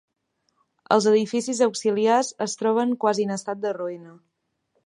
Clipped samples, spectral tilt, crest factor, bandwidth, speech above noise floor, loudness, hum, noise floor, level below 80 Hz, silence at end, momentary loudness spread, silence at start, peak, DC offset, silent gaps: under 0.1%; -4 dB/octave; 20 dB; 11.5 kHz; 50 dB; -23 LUFS; none; -73 dBFS; -78 dBFS; 0.75 s; 9 LU; 0.9 s; -4 dBFS; under 0.1%; none